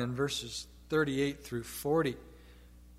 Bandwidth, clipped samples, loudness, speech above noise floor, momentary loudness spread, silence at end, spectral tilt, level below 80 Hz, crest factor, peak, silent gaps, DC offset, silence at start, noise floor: 16 kHz; under 0.1%; -34 LUFS; 22 dB; 10 LU; 0 s; -5 dB/octave; -56 dBFS; 18 dB; -18 dBFS; none; under 0.1%; 0 s; -55 dBFS